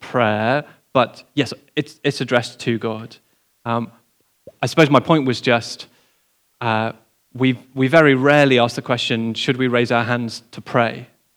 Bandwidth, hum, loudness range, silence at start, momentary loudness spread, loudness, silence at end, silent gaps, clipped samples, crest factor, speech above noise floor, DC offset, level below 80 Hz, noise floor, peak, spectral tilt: 15.5 kHz; none; 6 LU; 0 s; 13 LU; -18 LUFS; 0.35 s; none; under 0.1%; 20 dB; 45 dB; under 0.1%; -68 dBFS; -63 dBFS; 0 dBFS; -5.5 dB/octave